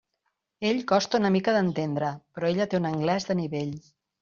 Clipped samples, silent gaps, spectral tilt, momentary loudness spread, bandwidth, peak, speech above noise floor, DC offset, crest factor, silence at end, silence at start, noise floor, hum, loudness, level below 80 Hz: under 0.1%; none; -5 dB/octave; 9 LU; 7.2 kHz; -10 dBFS; 53 dB; under 0.1%; 18 dB; 0.4 s; 0.6 s; -79 dBFS; none; -26 LUFS; -64 dBFS